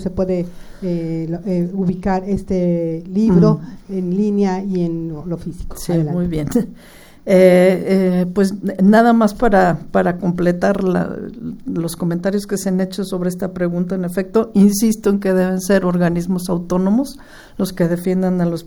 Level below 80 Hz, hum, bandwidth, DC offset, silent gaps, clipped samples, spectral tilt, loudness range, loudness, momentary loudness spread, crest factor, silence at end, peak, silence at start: -38 dBFS; none; over 20 kHz; under 0.1%; none; under 0.1%; -7 dB/octave; 6 LU; -17 LUFS; 12 LU; 16 dB; 0 s; 0 dBFS; 0 s